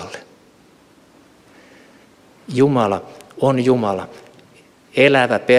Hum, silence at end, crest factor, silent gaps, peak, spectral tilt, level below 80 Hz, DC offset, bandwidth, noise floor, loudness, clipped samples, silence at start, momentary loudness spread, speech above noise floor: none; 0 s; 18 dB; none; -2 dBFS; -6.5 dB/octave; -62 dBFS; under 0.1%; 12.5 kHz; -51 dBFS; -17 LUFS; under 0.1%; 0 s; 22 LU; 35 dB